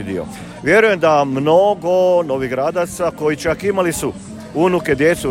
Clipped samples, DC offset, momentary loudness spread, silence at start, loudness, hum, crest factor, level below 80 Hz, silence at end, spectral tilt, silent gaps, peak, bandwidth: under 0.1%; under 0.1%; 12 LU; 0 s; -16 LUFS; none; 16 dB; -44 dBFS; 0 s; -5 dB/octave; none; 0 dBFS; 16.5 kHz